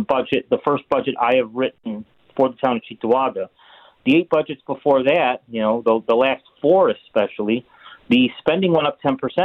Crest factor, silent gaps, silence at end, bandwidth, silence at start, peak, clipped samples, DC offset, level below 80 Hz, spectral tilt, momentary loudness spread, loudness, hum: 16 dB; none; 0 s; 5.2 kHz; 0 s; -4 dBFS; under 0.1%; under 0.1%; -60 dBFS; -8 dB/octave; 8 LU; -19 LUFS; none